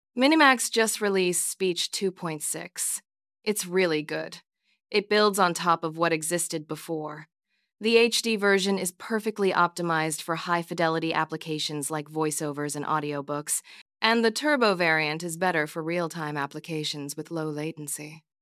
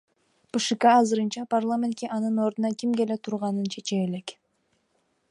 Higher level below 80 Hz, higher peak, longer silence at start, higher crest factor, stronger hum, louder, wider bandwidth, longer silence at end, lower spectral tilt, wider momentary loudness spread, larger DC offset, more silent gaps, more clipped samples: second, -84 dBFS vs -76 dBFS; first, -4 dBFS vs -8 dBFS; second, 0.15 s vs 0.55 s; first, 24 dB vs 18 dB; neither; about the same, -26 LUFS vs -25 LUFS; first, 16 kHz vs 11 kHz; second, 0.25 s vs 1 s; second, -3 dB/octave vs -5 dB/octave; about the same, 12 LU vs 10 LU; neither; first, 13.81-13.86 s vs none; neither